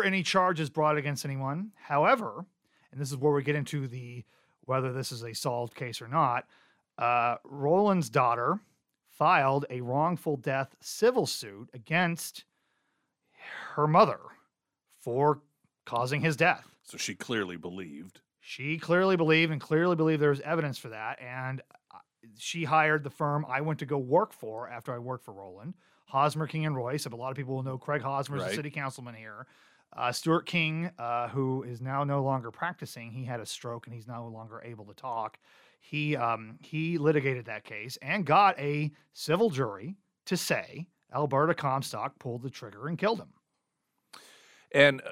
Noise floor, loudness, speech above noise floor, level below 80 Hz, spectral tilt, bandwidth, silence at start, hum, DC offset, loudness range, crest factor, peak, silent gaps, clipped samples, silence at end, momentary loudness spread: -81 dBFS; -29 LUFS; 52 dB; -76 dBFS; -5.5 dB/octave; 16 kHz; 0 s; none; under 0.1%; 6 LU; 24 dB; -6 dBFS; none; under 0.1%; 0 s; 17 LU